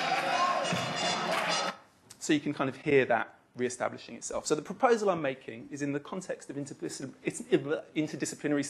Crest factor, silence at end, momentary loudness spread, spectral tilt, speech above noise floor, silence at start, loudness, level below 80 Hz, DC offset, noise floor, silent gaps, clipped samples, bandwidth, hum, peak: 20 dB; 0 s; 12 LU; -4 dB/octave; 23 dB; 0 s; -31 LUFS; -72 dBFS; under 0.1%; -54 dBFS; none; under 0.1%; 13 kHz; none; -10 dBFS